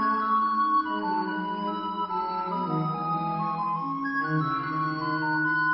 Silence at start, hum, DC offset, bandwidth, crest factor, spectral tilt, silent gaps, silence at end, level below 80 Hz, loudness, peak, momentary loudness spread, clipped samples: 0 s; none; under 0.1%; 5.8 kHz; 12 dB; -10 dB/octave; none; 0 s; -66 dBFS; -27 LUFS; -14 dBFS; 6 LU; under 0.1%